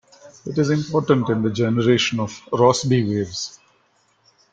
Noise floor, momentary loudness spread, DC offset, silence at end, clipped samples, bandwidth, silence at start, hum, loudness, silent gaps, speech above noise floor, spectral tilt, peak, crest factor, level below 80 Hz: -62 dBFS; 10 LU; under 0.1%; 1 s; under 0.1%; 9.2 kHz; 0.25 s; none; -20 LUFS; none; 43 dB; -5.5 dB/octave; -2 dBFS; 18 dB; -56 dBFS